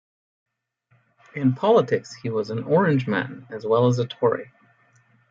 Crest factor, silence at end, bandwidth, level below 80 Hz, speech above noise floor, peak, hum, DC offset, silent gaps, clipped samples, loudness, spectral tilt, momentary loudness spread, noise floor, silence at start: 18 dB; 0.85 s; 7.6 kHz; -68 dBFS; 44 dB; -6 dBFS; none; under 0.1%; none; under 0.1%; -22 LUFS; -7.5 dB/octave; 11 LU; -65 dBFS; 1.35 s